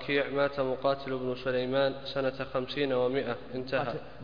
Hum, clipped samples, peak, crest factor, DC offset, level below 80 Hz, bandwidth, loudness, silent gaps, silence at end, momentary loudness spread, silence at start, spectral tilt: none; under 0.1%; -14 dBFS; 16 dB; 0.4%; -58 dBFS; 5.2 kHz; -31 LUFS; none; 0 s; 6 LU; 0 s; -7.5 dB/octave